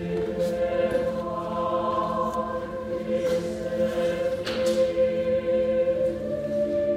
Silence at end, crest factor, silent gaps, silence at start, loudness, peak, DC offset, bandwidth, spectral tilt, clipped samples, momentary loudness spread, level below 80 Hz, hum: 0 s; 12 dB; none; 0 s; -26 LUFS; -12 dBFS; under 0.1%; 14 kHz; -6 dB/octave; under 0.1%; 6 LU; -50 dBFS; none